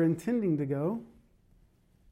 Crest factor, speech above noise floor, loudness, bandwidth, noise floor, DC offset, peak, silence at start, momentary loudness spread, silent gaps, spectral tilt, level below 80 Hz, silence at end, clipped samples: 14 dB; 35 dB; -31 LUFS; 14.5 kHz; -64 dBFS; under 0.1%; -18 dBFS; 0 s; 6 LU; none; -9 dB/octave; -66 dBFS; 1.05 s; under 0.1%